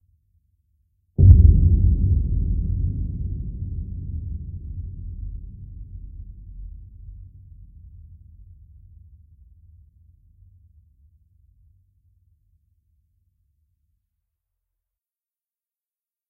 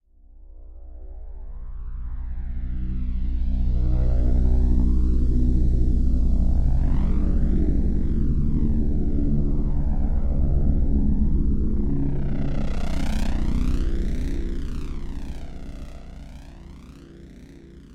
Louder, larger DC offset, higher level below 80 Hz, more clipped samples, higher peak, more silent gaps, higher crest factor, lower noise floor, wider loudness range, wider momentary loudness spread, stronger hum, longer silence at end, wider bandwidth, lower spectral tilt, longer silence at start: first, -21 LUFS vs -25 LUFS; neither; about the same, -26 dBFS vs -22 dBFS; neither; first, 0 dBFS vs -8 dBFS; neither; first, 24 dB vs 14 dB; first, under -90 dBFS vs -47 dBFS; first, 26 LU vs 11 LU; first, 28 LU vs 20 LU; neither; first, 8.35 s vs 0.15 s; second, 0.8 kHz vs 6 kHz; first, -15.5 dB/octave vs -9 dB/octave; first, 1.2 s vs 0.35 s